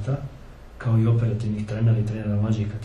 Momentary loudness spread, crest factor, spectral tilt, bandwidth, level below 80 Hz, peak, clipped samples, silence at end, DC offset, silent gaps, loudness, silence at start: 10 LU; 12 dB; -9 dB/octave; 7.2 kHz; -44 dBFS; -10 dBFS; under 0.1%; 0 s; under 0.1%; none; -24 LUFS; 0 s